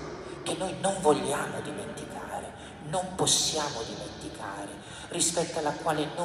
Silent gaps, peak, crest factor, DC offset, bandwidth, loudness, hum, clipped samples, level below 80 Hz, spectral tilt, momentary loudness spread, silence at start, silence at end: none; -10 dBFS; 20 dB; under 0.1%; 16 kHz; -30 LUFS; none; under 0.1%; -56 dBFS; -2.5 dB/octave; 15 LU; 0 s; 0 s